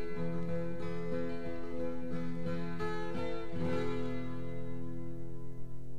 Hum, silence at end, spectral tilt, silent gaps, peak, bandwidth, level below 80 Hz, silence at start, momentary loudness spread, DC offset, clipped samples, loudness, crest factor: none; 0 s; -8 dB/octave; none; -22 dBFS; 12.5 kHz; -54 dBFS; 0 s; 8 LU; 2%; under 0.1%; -40 LUFS; 14 dB